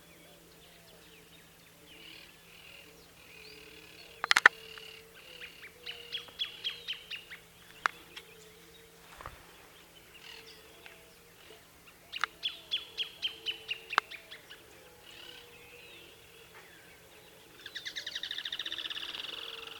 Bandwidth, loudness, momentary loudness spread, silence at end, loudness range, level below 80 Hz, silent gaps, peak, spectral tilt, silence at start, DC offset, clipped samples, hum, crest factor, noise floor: 19 kHz; -34 LUFS; 20 LU; 0 s; 20 LU; -70 dBFS; none; -2 dBFS; 0 dB/octave; 0 s; under 0.1%; under 0.1%; none; 38 dB; -57 dBFS